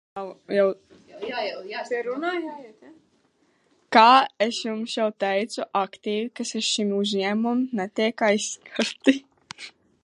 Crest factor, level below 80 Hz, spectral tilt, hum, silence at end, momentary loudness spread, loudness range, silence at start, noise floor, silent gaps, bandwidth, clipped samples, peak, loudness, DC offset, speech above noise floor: 24 dB; -76 dBFS; -3.5 dB/octave; none; 0.35 s; 18 LU; 7 LU; 0.15 s; -65 dBFS; none; 11.5 kHz; under 0.1%; -2 dBFS; -23 LUFS; under 0.1%; 42 dB